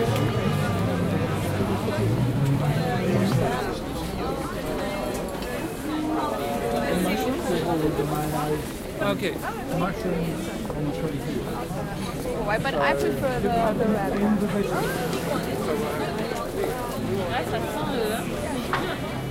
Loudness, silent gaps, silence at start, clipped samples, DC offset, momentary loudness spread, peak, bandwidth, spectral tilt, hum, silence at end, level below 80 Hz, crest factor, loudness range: -26 LUFS; none; 0 s; under 0.1%; under 0.1%; 6 LU; -10 dBFS; 16 kHz; -6 dB/octave; none; 0 s; -42 dBFS; 16 dB; 4 LU